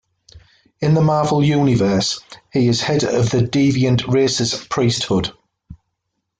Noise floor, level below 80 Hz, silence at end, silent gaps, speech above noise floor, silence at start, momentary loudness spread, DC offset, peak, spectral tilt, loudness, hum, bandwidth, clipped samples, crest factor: -75 dBFS; -48 dBFS; 0.65 s; none; 59 dB; 0.35 s; 6 LU; under 0.1%; -4 dBFS; -5.5 dB/octave; -17 LUFS; none; 9.4 kHz; under 0.1%; 12 dB